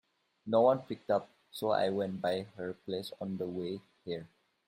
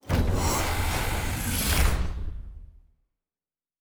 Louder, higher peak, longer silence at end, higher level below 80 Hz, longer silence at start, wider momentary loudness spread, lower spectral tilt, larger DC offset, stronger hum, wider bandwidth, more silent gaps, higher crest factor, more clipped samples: second, -34 LUFS vs -27 LUFS; second, -14 dBFS vs -10 dBFS; second, 0.4 s vs 1.15 s; second, -76 dBFS vs -30 dBFS; first, 0.45 s vs 0.05 s; about the same, 14 LU vs 15 LU; first, -6.5 dB/octave vs -4 dB/octave; neither; neither; second, 16 kHz vs over 20 kHz; neither; about the same, 20 dB vs 18 dB; neither